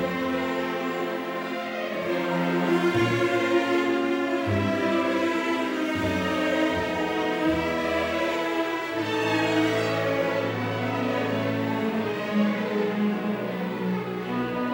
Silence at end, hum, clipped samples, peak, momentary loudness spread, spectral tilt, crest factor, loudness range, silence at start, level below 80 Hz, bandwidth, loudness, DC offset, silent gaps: 0 s; none; under 0.1%; -10 dBFS; 6 LU; -6 dB/octave; 16 dB; 2 LU; 0 s; -56 dBFS; 19.5 kHz; -26 LUFS; under 0.1%; none